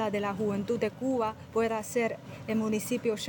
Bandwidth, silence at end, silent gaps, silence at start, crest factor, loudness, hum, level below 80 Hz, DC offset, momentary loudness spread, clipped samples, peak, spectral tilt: 17 kHz; 0 s; none; 0 s; 14 dB; -31 LUFS; none; -64 dBFS; under 0.1%; 2 LU; under 0.1%; -16 dBFS; -5 dB/octave